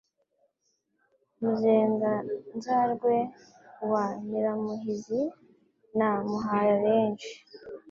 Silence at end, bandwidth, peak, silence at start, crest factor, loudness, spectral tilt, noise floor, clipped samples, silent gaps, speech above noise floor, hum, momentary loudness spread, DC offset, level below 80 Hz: 0 s; 7.4 kHz; -12 dBFS; 1.4 s; 18 dB; -28 LUFS; -7 dB/octave; -76 dBFS; under 0.1%; none; 49 dB; none; 13 LU; under 0.1%; -72 dBFS